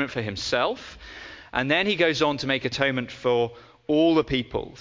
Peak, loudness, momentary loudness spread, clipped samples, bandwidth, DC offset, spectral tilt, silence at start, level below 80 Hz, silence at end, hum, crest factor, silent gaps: -4 dBFS; -24 LUFS; 18 LU; under 0.1%; 7.6 kHz; under 0.1%; -5 dB/octave; 0 s; -50 dBFS; 0 s; none; 20 dB; none